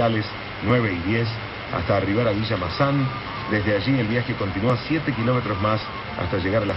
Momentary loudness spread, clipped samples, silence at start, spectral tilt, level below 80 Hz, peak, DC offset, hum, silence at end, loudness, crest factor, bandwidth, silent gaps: 7 LU; under 0.1%; 0 s; -9 dB/octave; -44 dBFS; -8 dBFS; under 0.1%; none; 0 s; -23 LUFS; 16 dB; 6 kHz; none